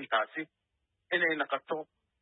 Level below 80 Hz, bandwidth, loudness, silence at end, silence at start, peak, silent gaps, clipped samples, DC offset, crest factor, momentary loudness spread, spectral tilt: -88 dBFS; 4.1 kHz; -32 LUFS; 0.4 s; 0 s; -16 dBFS; none; under 0.1%; under 0.1%; 18 dB; 15 LU; -7 dB/octave